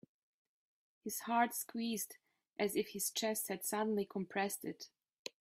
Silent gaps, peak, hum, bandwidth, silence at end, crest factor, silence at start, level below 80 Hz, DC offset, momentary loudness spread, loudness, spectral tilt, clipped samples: 5.19-5.25 s; -20 dBFS; none; 16 kHz; 0.1 s; 22 dB; 1.05 s; -84 dBFS; under 0.1%; 16 LU; -39 LUFS; -3 dB/octave; under 0.1%